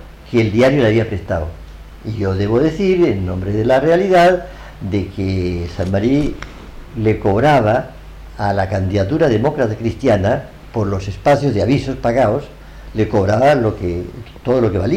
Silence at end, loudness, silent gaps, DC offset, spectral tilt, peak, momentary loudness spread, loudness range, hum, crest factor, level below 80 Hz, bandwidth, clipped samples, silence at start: 0 s; -16 LUFS; none; under 0.1%; -7.5 dB/octave; -4 dBFS; 14 LU; 2 LU; none; 12 dB; -36 dBFS; 12.5 kHz; under 0.1%; 0 s